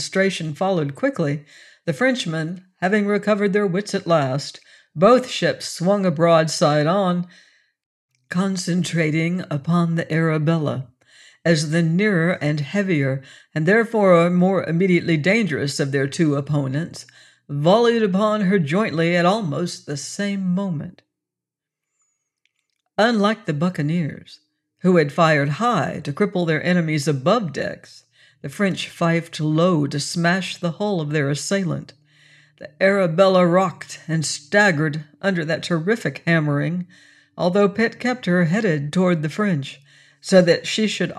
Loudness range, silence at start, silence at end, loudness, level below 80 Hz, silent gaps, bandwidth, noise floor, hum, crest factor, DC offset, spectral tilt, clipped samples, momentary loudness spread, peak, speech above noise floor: 4 LU; 0 s; 0 s; -20 LUFS; -66 dBFS; 7.86-8.09 s; 12 kHz; -86 dBFS; none; 16 dB; under 0.1%; -6 dB/octave; under 0.1%; 11 LU; -4 dBFS; 67 dB